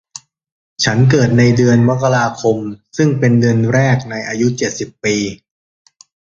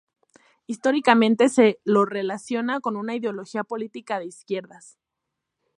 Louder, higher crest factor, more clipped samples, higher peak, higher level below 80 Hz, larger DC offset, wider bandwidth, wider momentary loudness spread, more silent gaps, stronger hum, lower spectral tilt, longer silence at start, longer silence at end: first, -14 LUFS vs -23 LUFS; second, 14 dB vs 22 dB; neither; about the same, 0 dBFS vs -2 dBFS; first, -46 dBFS vs -76 dBFS; neither; second, 7.6 kHz vs 11.5 kHz; second, 10 LU vs 14 LU; neither; neither; about the same, -6 dB/octave vs -5 dB/octave; about the same, 0.8 s vs 0.7 s; second, 1 s vs 1.15 s